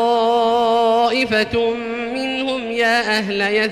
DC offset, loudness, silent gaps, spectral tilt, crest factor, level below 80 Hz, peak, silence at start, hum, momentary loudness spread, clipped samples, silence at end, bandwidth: under 0.1%; -17 LUFS; none; -4 dB/octave; 10 dB; -50 dBFS; -6 dBFS; 0 s; none; 6 LU; under 0.1%; 0 s; 14.5 kHz